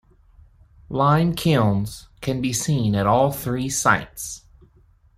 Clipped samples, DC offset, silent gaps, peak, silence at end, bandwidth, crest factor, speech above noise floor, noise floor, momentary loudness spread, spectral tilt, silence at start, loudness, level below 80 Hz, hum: under 0.1%; under 0.1%; none; -2 dBFS; 0.8 s; 16 kHz; 20 dB; 35 dB; -55 dBFS; 14 LU; -5 dB/octave; 0.9 s; -21 LUFS; -46 dBFS; none